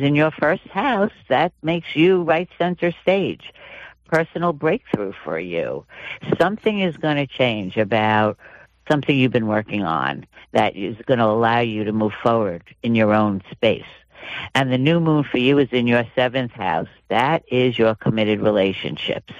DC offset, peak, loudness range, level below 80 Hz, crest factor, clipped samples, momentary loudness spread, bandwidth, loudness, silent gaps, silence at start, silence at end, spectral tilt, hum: under 0.1%; -4 dBFS; 3 LU; -56 dBFS; 16 dB; under 0.1%; 10 LU; 10.5 kHz; -20 LUFS; none; 0 s; 0 s; -7.5 dB/octave; none